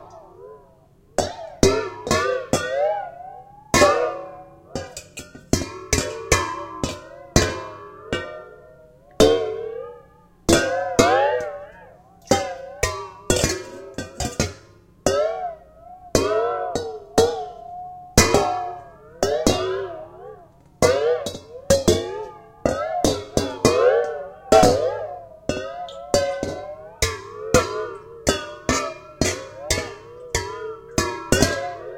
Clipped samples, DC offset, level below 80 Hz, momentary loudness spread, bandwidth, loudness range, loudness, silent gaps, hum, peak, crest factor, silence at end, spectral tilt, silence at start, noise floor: under 0.1%; under 0.1%; -38 dBFS; 18 LU; 16.5 kHz; 5 LU; -22 LUFS; none; none; 0 dBFS; 22 dB; 0 s; -4 dB/octave; 0 s; -53 dBFS